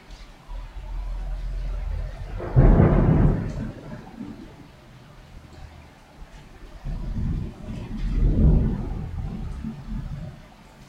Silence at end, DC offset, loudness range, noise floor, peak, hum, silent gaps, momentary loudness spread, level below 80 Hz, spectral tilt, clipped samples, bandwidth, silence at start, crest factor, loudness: 0.05 s; under 0.1%; 16 LU; -47 dBFS; -4 dBFS; none; none; 27 LU; -28 dBFS; -9.5 dB/octave; under 0.1%; 5.8 kHz; 0.1 s; 20 dB; -25 LUFS